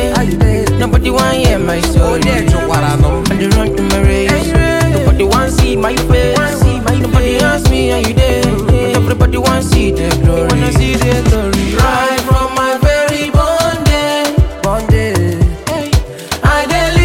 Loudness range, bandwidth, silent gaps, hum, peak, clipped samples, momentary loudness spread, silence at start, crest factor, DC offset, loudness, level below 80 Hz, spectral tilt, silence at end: 1 LU; 17 kHz; none; none; 0 dBFS; under 0.1%; 3 LU; 0 s; 10 dB; under 0.1%; -12 LUFS; -16 dBFS; -5.5 dB/octave; 0 s